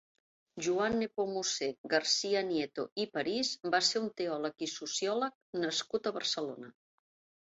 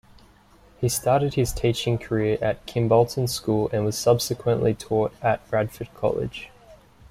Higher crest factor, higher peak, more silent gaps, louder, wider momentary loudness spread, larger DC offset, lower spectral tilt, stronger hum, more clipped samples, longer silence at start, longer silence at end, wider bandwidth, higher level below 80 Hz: about the same, 22 dB vs 18 dB; second, -14 dBFS vs -6 dBFS; first, 1.78-1.84 s, 2.92-2.96 s, 5.35-5.53 s vs none; second, -33 LUFS vs -24 LUFS; about the same, 8 LU vs 7 LU; neither; second, -1.5 dB/octave vs -5.5 dB/octave; neither; neither; second, 0.55 s vs 0.8 s; first, 0.85 s vs 0.35 s; second, 8 kHz vs 16 kHz; second, -72 dBFS vs -46 dBFS